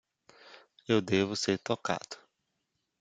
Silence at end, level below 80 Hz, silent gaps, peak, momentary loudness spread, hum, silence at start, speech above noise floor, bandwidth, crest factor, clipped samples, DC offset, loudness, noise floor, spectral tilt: 0.85 s; -72 dBFS; none; -12 dBFS; 19 LU; none; 0.45 s; 51 dB; 9.4 kHz; 22 dB; under 0.1%; under 0.1%; -31 LUFS; -82 dBFS; -4.5 dB/octave